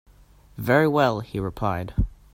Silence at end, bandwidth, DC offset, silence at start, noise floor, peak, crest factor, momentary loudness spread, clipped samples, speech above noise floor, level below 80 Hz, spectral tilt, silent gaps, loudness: 0.2 s; 16 kHz; under 0.1%; 0.55 s; -53 dBFS; -4 dBFS; 20 dB; 11 LU; under 0.1%; 30 dB; -36 dBFS; -7.5 dB/octave; none; -24 LUFS